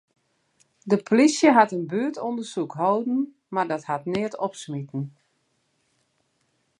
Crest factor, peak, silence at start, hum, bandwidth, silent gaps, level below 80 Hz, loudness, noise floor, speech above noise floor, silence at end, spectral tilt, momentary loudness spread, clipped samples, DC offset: 22 dB; -2 dBFS; 0.85 s; none; 11.5 kHz; none; -72 dBFS; -24 LUFS; -71 dBFS; 48 dB; 1.7 s; -5.5 dB/octave; 15 LU; under 0.1%; under 0.1%